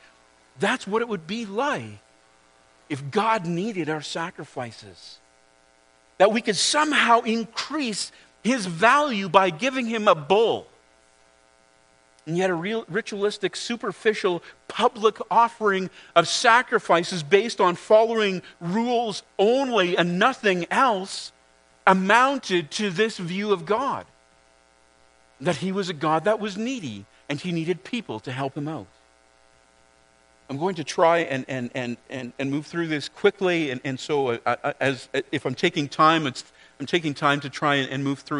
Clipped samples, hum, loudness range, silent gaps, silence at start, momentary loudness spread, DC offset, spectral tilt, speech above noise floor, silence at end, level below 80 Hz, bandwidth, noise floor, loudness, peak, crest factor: under 0.1%; none; 8 LU; none; 0.6 s; 13 LU; under 0.1%; -4.5 dB/octave; 36 dB; 0 s; -70 dBFS; 10.5 kHz; -59 dBFS; -23 LUFS; -2 dBFS; 24 dB